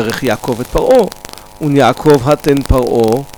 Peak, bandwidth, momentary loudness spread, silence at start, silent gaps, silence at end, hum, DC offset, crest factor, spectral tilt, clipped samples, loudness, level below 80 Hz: 0 dBFS; over 20 kHz; 10 LU; 0 s; none; 0.05 s; none; under 0.1%; 12 dB; -6 dB/octave; under 0.1%; -12 LUFS; -26 dBFS